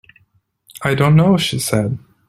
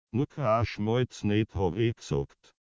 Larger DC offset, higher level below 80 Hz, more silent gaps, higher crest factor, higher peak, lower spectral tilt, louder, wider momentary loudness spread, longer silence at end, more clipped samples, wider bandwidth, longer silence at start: neither; about the same, -50 dBFS vs -46 dBFS; neither; about the same, 16 dB vs 16 dB; first, -2 dBFS vs -12 dBFS; second, -5.5 dB/octave vs -7 dB/octave; first, -16 LUFS vs -29 LUFS; first, 11 LU vs 6 LU; about the same, 0.3 s vs 0.35 s; neither; first, 14.5 kHz vs 7.8 kHz; first, 0.75 s vs 0.15 s